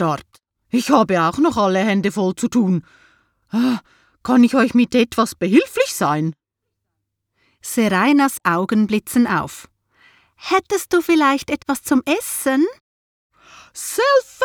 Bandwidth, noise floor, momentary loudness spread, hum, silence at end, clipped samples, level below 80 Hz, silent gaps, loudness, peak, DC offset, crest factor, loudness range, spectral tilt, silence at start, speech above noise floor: 18.5 kHz; -78 dBFS; 10 LU; none; 0 s; under 0.1%; -56 dBFS; 12.80-13.30 s; -18 LUFS; 0 dBFS; under 0.1%; 18 dB; 2 LU; -5 dB/octave; 0 s; 61 dB